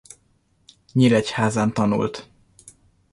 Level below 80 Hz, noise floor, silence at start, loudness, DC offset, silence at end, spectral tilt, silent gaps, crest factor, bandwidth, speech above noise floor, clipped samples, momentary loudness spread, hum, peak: -56 dBFS; -63 dBFS; 0.95 s; -21 LUFS; under 0.1%; 0.9 s; -6 dB/octave; none; 18 dB; 11.5 kHz; 44 dB; under 0.1%; 10 LU; none; -4 dBFS